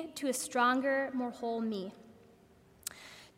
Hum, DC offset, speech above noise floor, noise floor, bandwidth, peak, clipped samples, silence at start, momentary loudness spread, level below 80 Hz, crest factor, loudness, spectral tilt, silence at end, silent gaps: none; under 0.1%; 29 dB; -62 dBFS; 16 kHz; -16 dBFS; under 0.1%; 0 s; 16 LU; -76 dBFS; 18 dB; -34 LUFS; -3 dB/octave; 0.1 s; none